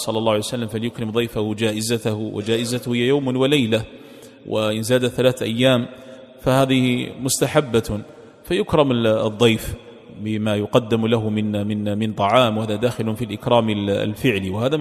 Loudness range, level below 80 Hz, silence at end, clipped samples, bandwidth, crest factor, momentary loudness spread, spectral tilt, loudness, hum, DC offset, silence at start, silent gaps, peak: 2 LU; -48 dBFS; 0 s; under 0.1%; 15 kHz; 20 dB; 8 LU; -5.5 dB/octave; -20 LUFS; none; under 0.1%; 0 s; none; 0 dBFS